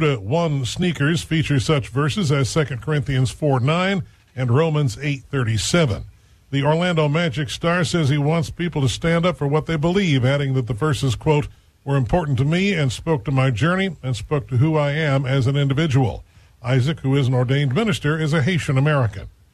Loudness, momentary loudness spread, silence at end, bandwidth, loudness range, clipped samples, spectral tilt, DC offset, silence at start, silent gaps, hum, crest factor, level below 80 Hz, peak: -20 LUFS; 5 LU; 0.25 s; 12.5 kHz; 1 LU; under 0.1%; -6 dB/octave; under 0.1%; 0 s; none; none; 14 dB; -42 dBFS; -4 dBFS